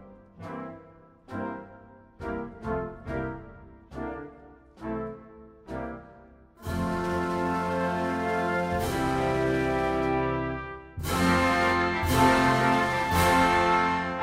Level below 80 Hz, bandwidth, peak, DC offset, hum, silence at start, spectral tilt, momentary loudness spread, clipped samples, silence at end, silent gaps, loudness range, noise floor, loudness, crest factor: -44 dBFS; 16 kHz; -8 dBFS; under 0.1%; none; 0 s; -5.5 dB/octave; 19 LU; under 0.1%; 0 s; none; 14 LU; -53 dBFS; -26 LUFS; 20 dB